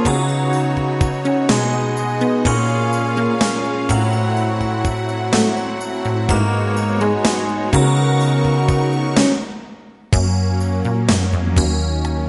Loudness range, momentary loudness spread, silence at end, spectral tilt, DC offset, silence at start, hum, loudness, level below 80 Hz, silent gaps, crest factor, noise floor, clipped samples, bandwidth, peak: 2 LU; 5 LU; 0 s; -6 dB/octave; under 0.1%; 0 s; none; -18 LUFS; -30 dBFS; none; 16 dB; -39 dBFS; under 0.1%; 11.5 kHz; 0 dBFS